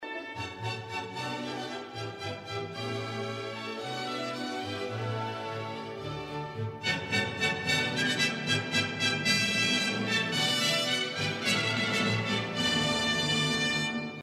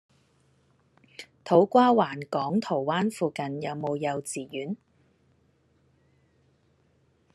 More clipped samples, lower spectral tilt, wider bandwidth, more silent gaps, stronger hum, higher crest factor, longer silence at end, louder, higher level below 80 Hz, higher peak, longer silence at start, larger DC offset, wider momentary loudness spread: neither; second, -3.5 dB/octave vs -6 dB/octave; first, 15.5 kHz vs 13 kHz; neither; neither; about the same, 20 dB vs 22 dB; second, 0 s vs 2.6 s; second, -29 LUFS vs -26 LUFS; first, -62 dBFS vs -76 dBFS; second, -12 dBFS vs -6 dBFS; second, 0 s vs 1.2 s; neither; second, 11 LU vs 20 LU